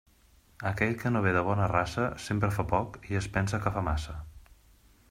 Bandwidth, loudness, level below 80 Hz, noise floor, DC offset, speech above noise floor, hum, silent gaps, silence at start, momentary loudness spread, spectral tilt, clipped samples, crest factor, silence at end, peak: 15.5 kHz; -30 LUFS; -46 dBFS; -61 dBFS; under 0.1%; 32 dB; none; none; 0.6 s; 8 LU; -6.5 dB/octave; under 0.1%; 22 dB; 0.7 s; -10 dBFS